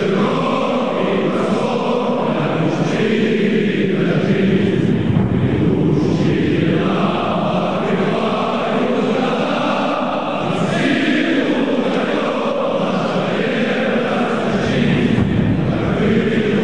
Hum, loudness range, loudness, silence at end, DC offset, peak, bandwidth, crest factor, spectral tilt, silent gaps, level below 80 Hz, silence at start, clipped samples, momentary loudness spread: none; 2 LU; -17 LUFS; 0 s; 1%; -2 dBFS; 10 kHz; 14 dB; -7 dB/octave; none; -40 dBFS; 0 s; under 0.1%; 3 LU